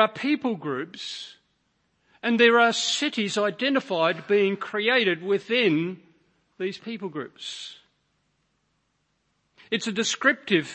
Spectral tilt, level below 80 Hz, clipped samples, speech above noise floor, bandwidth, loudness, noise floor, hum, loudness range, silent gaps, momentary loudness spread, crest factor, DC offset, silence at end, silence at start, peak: -3.5 dB/octave; -78 dBFS; under 0.1%; 48 dB; 8.8 kHz; -24 LUFS; -73 dBFS; none; 15 LU; none; 15 LU; 22 dB; under 0.1%; 0 s; 0 s; -4 dBFS